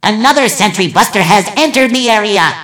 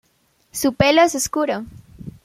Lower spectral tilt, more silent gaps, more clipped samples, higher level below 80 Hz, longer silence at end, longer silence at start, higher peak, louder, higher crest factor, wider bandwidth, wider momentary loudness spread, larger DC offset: about the same, -3 dB/octave vs -4 dB/octave; neither; first, 1% vs under 0.1%; about the same, -50 dBFS vs -46 dBFS; second, 0 s vs 0.15 s; second, 0.05 s vs 0.55 s; about the same, 0 dBFS vs -2 dBFS; first, -9 LUFS vs -18 LUFS; second, 10 dB vs 20 dB; first, over 20 kHz vs 16.5 kHz; second, 2 LU vs 24 LU; neither